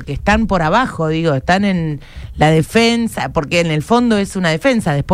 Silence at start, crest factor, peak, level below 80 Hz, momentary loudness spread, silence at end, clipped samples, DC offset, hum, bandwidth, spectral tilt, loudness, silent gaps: 0 s; 14 dB; 0 dBFS; -32 dBFS; 6 LU; 0 s; under 0.1%; under 0.1%; none; 15 kHz; -6 dB/octave; -15 LUFS; none